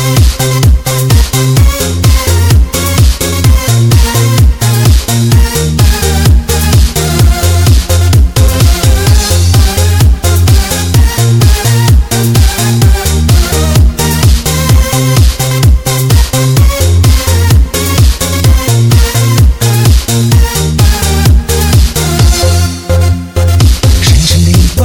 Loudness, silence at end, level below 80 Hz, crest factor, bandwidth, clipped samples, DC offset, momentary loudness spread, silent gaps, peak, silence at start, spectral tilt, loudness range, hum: -8 LUFS; 0 s; -10 dBFS; 6 dB; 18 kHz; 0.7%; under 0.1%; 2 LU; none; 0 dBFS; 0 s; -4.5 dB/octave; 1 LU; none